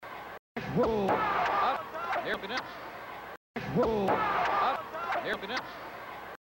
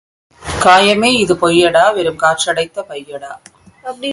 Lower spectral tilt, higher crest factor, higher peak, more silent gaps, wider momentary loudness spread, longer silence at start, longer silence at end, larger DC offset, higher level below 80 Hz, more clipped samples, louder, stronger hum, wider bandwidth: first, -5.5 dB/octave vs -3.5 dB/octave; about the same, 16 dB vs 14 dB; second, -16 dBFS vs 0 dBFS; first, 0.39-0.55 s, 3.37-3.54 s vs none; second, 14 LU vs 20 LU; second, 0 s vs 0.4 s; about the same, 0.1 s vs 0 s; neither; second, -56 dBFS vs -42 dBFS; neither; second, -30 LUFS vs -12 LUFS; neither; first, 16 kHz vs 11.5 kHz